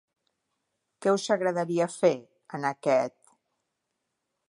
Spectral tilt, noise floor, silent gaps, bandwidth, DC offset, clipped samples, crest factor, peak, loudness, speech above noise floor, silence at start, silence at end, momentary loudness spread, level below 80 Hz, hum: -5 dB/octave; -82 dBFS; none; 11.5 kHz; under 0.1%; under 0.1%; 20 dB; -10 dBFS; -27 LUFS; 56 dB; 1 s; 1.4 s; 10 LU; -84 dBFS; none